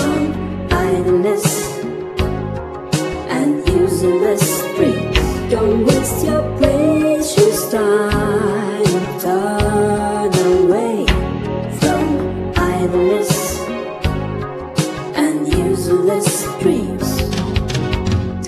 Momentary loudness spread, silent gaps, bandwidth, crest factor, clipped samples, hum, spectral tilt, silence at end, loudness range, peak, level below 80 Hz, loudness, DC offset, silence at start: 7 LU; none; 14 kHz; 16 dB; under 0.1%; none; -5.5 dB/octave; 0 s; 3 LU; 0 dBFS; -30 dBFS; -17 LUFS; under 0.1%; 0 s